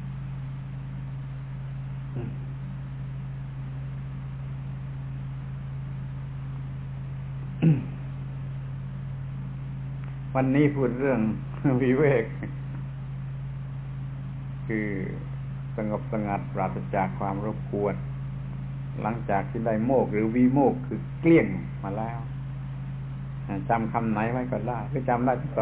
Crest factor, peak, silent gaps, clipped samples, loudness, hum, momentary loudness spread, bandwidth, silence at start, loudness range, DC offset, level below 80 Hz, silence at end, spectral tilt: 18 dB; -10 dBFS; none; under 0.1%; -29 LUFS; none; 13 LU; 4 kHz; 0 s; 11 LU; under 0.1%; -46 dBFS; 0 s; -8.5 dB/octave